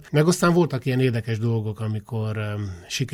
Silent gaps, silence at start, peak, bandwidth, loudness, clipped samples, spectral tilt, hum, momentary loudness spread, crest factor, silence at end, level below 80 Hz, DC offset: none; 0 s; -8 dBFS; 16 kHz; -23 LUFS; under 0.1%; -6 dB/octave; none; 11 LU; 16 dB; 0 s; -54 dBFS; under 0.1%